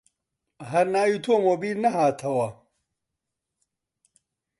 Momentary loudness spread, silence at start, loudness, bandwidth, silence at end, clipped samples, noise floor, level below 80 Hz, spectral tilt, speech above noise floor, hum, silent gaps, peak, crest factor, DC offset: 6 LU; 0.6 s; -24 LUFS; 11.5 kHz; 2.05 s; under 0.1%; -84 dBFS; -72 dBFS; -6 dB/octave; 61 dB; none; none; -8 dBFS; 18 dB; under 0.1%